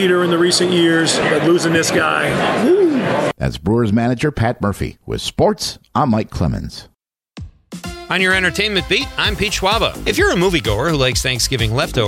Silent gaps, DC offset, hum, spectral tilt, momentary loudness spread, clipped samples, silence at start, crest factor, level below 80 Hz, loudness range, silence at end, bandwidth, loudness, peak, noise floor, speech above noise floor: none; under 0.1%; none; -4.5 dB/octave; 9 LU; under 0.1%; 0 s; 14 dB; -34 dBFS; 6 LU; 0 s; 16.5 kHz; -16 LUFS; -2 dBFS; -39 dBFS; 23 dB